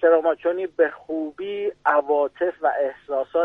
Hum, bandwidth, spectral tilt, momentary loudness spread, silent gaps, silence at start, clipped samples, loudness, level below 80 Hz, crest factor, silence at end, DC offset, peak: none; 3.9 kHz; -6.5 dB/octave; 9 LU; none; 0 s; under 0.1%; -23 LUFS; -66 dBFS; 16 dB; 0 s; under 0.1%; -6 dBFS